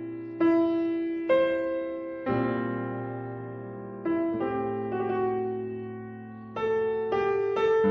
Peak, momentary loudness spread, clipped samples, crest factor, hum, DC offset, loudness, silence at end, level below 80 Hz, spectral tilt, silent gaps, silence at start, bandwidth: -12 dBFS; 14 LU; under 0.1%; 16 dB; none; under 0.1%; -28 LUFS; 0 s; -62 dBFS; -8.5 dB/octave; none; 0 s; 6.2 kHz